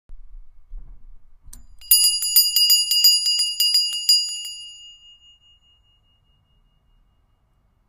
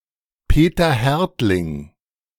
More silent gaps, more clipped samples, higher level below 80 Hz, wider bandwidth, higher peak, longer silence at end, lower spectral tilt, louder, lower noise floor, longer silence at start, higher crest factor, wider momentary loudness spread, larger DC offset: neither; neither; second, -46 dBFS vs -26 dBFS; second, 16 kHz vs 18 kHz; about the same, -2 dBFS vs -2 dBFS; first, 3 s vs 0.5 s; second, 4.5 dB/octave vs -6.5 dB/octave; first, -15 LUFS vs -18 LUFS; first, -63 dBFS vs -49 dBFS; second, 0.1 s vs 0.5 s; first, 22 dB vs 16 dB; first, 16 LU vs 10 LU; neither